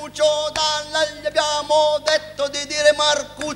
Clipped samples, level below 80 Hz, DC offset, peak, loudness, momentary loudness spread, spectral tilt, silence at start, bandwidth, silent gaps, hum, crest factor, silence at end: under 0.1%; -52 dBFS; under 0.1%; -2 dBFS; -19 LUFS; 6 LU; -1 dB/octave; 0 s; 13 kHz; none; 50 Hz at -50 dBFS; 18 dB; 0 s